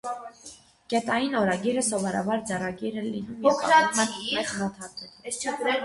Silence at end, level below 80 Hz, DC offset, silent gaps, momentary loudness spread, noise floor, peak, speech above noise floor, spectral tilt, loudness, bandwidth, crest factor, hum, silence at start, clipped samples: 0 s; -62 dBFS; under 0.1%; none; 19 LU; -49 dBFS; -6 dBFS; 23 dB; -3.5 dB/octave; -26 LUFS; 11.5 kHz; 20 dB; none; 0.05 s; under 0.1%